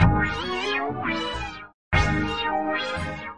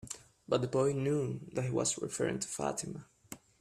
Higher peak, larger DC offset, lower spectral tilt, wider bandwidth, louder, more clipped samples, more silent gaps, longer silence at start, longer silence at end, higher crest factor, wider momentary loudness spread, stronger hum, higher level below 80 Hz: first, -4 dBFS vs -16 dBFS; neither; about the same, -6 dB/octave vs -5 dB/octave; second, 11 kHz vs 14.5 kHz; first, -25 LUFS vs -34 LUFS; neither; first, 1.74-1.91 s vs none; about the same, 0 s vs 0.05 s; second, 0 s vs 0.25 s; about the same, 20 dB vs 20 dB; second, 8 LU vs 18 LU; neither; first, -36 dBFS vs -66 dBFS